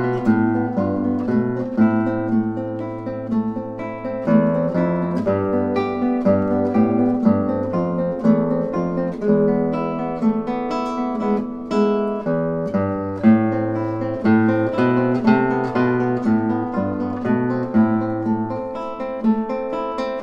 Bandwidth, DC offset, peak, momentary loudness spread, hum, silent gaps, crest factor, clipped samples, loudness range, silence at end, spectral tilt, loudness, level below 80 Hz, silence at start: 6.8 kHz; under 0.1%; -4 dBFS; 7 LU; none; none; 16 dB; under 0.1%; 3 LU; 0 s; -9.5 dB/octave; -20 LUFS; -50 dBFS; 0 s